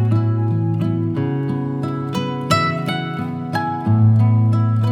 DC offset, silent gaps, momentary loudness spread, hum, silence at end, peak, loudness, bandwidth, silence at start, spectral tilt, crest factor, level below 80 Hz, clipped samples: under 0.1%; none; 8 LU; none; 0 s; -2 dBFS; -19 LUFS; 10.5 kHz; 0 s; -7.5 dB/octave; 16 dB; -58 dBFS; under 0.1%